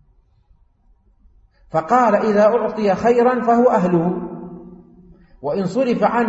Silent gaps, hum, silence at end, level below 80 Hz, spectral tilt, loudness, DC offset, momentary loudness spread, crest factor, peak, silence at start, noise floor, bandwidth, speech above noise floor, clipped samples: none; none; 0 s; -52 dBFS; -7.5 dB/octave; -17 LUFS; under 0.1%; 15 LU; 16 dB; -4 dBFS; 1.75 s; -56 dBFS; 8 kHz; 40 dB; under 0.1%